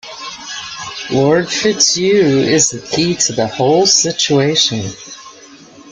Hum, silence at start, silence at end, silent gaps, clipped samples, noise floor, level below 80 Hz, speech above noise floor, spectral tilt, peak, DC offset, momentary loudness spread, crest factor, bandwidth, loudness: none; 0.05 s; 0 s; none; under 0.1%; -39 dBFS; -52 dBFS; 26 dB; -3 dB/octave; 0 dBFS; under 0.1%; 16 LU; 14 dB; 11 kHz; -12 LUFS